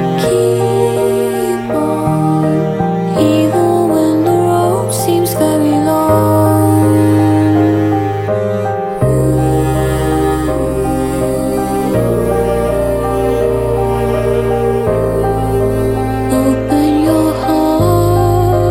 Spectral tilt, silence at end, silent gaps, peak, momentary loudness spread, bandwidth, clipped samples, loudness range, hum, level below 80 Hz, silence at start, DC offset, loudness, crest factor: -7 dB/octave; 0 s; none; 0 dBFS; 5 LU; 16.5 kHz; under 0.1%; 3 LU; none; -28 dBFS; 0 s; under 0.1%; -13 LUFS; 12 dB